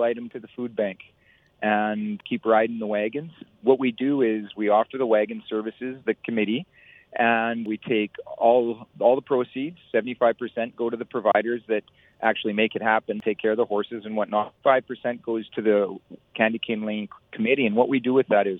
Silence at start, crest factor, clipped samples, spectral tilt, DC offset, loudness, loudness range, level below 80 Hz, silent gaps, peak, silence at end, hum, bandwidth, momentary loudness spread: 0 s; 20 dB; under 0.1%; -8.5 dB/octave; under 0.1%; -24 LUFS; 2 LU; -72 dBFS; none; -4 dBFS; 0 s; none; 4 kHz; 9 LU